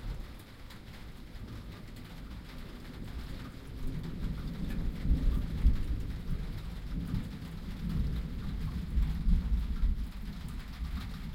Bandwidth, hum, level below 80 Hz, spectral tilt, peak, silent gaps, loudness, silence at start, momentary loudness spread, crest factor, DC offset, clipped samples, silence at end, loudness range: 15.5 kHz; none; -34 dBFS; -7 dB/octave; -14 dBFS; none; -38 LUFS; 0 s; 15 LU; 20 dB; under 0.1%; under 0.1%; 0 s; 10 LU